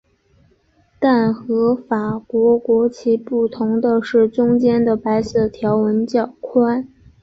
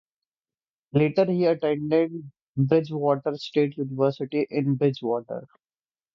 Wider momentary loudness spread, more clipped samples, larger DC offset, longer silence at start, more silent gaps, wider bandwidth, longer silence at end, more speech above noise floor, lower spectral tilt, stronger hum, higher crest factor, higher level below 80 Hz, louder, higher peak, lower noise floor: second, 5 LU vs 8 LU; neither; neither; about the same, 1 s vs 0.95 s; second, none vs 2.42-2.54 s; about the same, 7.6 kHz vs 7.2 kHz; second, 0.35 s vs 0.7 s; second, 41 dB vs over 66 dB; about the same, -8 dB/octave vs -9 dB/octave; neither; about the same, 14 dB vs 18 dB; first, -52 dBFS vs -64 dBFS; first, -17 LUFS vs -24 LUFS; first, -4 dBFS vs -8 dBFS; second, -57 dBFS vs under -90 dBFS